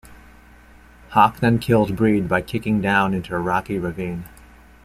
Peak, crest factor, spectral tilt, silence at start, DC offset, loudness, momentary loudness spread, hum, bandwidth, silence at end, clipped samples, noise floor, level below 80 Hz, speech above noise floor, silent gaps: -2 dBFS; 18 dB; -7 dB/octave; 0.1 s; under 0.1%; -20 LUFS; 10 LU; none; 15.5 kHz; 0.55 s; under 0.1%; -47 dBFS; -46 dBFS; 28 dB; none